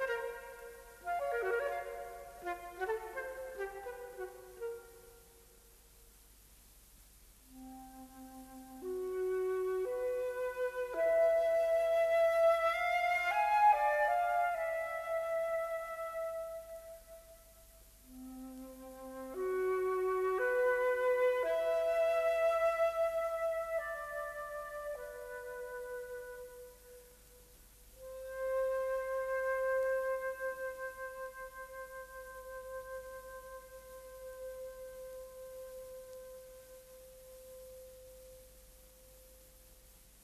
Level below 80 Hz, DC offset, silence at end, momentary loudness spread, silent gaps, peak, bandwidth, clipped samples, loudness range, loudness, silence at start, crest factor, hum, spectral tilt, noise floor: -64 dBFS; under 0.1%; 0.3 s; 22 LU; none; -18 dBFS; 14 kHz; under 0.1%; 20 LU; -35 LUFS; 0 s; 18 dB; none; -3.5 dB/octave; -61 dBFS